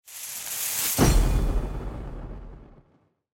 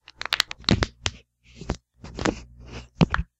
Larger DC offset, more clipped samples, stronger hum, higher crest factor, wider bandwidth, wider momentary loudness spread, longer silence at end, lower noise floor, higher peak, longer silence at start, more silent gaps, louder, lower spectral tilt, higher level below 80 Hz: neither; neither; neither; second, 20 dB vs 28 dB; first, 17 kHz vs 15 kHz; about the same, 20 LU vs 19 LU; first, 0.6 s vs 0.15 s; first, -64 dBFS vs -50 dBFS; second, -6 dBFS vs 0 dBFS; second, 0.05 s vs 0.2 s; neither; about the same, -26 LUFS vs -26 LUFS; about the same, -4 dB/octave vs -4.5 dB/octave; first, -28 dBFS vs -38 dBFS